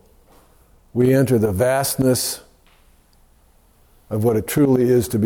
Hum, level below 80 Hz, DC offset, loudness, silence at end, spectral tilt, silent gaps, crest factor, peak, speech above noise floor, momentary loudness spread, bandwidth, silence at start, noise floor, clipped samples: none; -50 dBFS; under 0.1%; -18 LUFS; 0 s; -5.5 dB/octave; none; 14 dB; -6 dBFS; 37 dB; 10 LU; 18.5 kHz; 0.95 s; -54 dBFS; under 0.1%